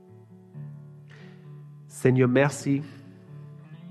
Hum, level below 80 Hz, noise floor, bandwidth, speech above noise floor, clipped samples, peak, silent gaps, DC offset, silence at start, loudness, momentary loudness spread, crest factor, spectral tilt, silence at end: none; -68 dBFS; -50 dBFS; 13 kHz; 27 dB; under 0.1%; -6 dBFS; none; under 0.1%; 0.55 s; -24 LUFS; 26 LU; 22 dB; -7 dB/octave; 0 s